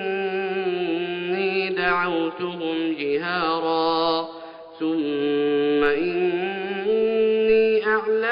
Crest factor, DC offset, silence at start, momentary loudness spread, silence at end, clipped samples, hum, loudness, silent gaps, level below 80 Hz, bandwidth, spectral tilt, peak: 16 dB; under 0.1%; 0 s; 7 LU; 0 s; under 0.1%; none; -22 LUFS; none; -58 dBFS; 5.4 kHz; -2.5 dB/octave; -6 dBFS